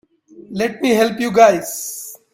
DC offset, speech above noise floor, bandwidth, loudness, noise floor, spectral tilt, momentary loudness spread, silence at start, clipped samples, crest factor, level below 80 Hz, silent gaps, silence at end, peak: under 0.1%; 27 dB; 16.5 kHz; -16 LUFS; -42 dBFS; -4 dB/octave; 16 LU; 0.35 s; under 0.1%; 18 dB; -58 dBFS; none; 0.2 s; 0 dBFS